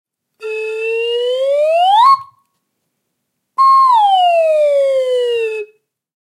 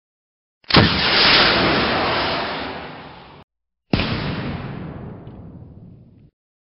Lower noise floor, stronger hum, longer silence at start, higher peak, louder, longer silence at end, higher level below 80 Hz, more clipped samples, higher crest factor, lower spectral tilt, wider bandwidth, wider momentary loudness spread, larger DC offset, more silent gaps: first, -72 dBFS vs -45 dBFS; neither; second, 0.4 s vs 0.7 s; about the same, 0 dBFS vs 0 dBFS; first, -13 LUFS vs -17 LUFS; second, 0.55 s vs 0.85 s; second, -80 dBFS vs -40 dBFS; neither; second, 14 dB vs 20 dB; second, 0 dB/octave vs -7.5 dB/octave; first, 12.5 kHz vs 6 kHz; second, 15 LU vs 23 LU; neither; second, none vs 3.44-3.48 s